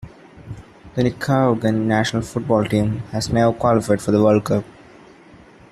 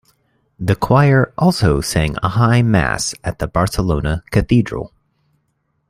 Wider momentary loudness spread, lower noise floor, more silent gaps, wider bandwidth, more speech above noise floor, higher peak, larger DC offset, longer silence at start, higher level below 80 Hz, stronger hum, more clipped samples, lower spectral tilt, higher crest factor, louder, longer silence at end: first, 18 LU vs 10 LU; second, -46 dBFS vs -67 dBFS; neither; second, 14 kHz vs 15.5 kHz; second, 28 dB vs 52 dB; about the same, -2 dBFS vs -2 dBFS; neither; second, 0 s vs 0.6 s; second, -46 dBFS vs -32 dBFS; neither; neither; about the same, -6.5 dB/octave vs -6 dB/octave; about the same, 16 dB vs 14 dB; second, -19 LUFS vs -16 LUFS; about the same, 1 s vs 1.05 s